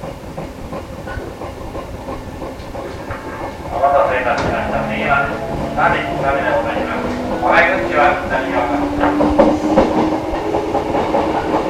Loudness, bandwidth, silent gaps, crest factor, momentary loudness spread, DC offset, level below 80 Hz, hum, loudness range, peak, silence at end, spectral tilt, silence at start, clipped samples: -16 LUFS; 15.5 kHz; none; 16 dB; 15 LU; under 0.1%; -34 dBFS; none; 11 LU; 0 dBFS; 0 s; -6 dB/octave; 0 s; under 0.1%